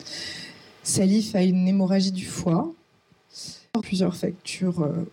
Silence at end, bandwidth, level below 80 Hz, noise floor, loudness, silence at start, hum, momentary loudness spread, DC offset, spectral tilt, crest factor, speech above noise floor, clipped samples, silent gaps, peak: 0.05 s; 15.5 kHz; -60 dBFS; -61 dBFS; -24 LUFS; 0 s; none; 17 LU; under 0.1%; -5.5 dB/octave; 14 dB; 38 dB; under 0.1%; none; -12 dBFS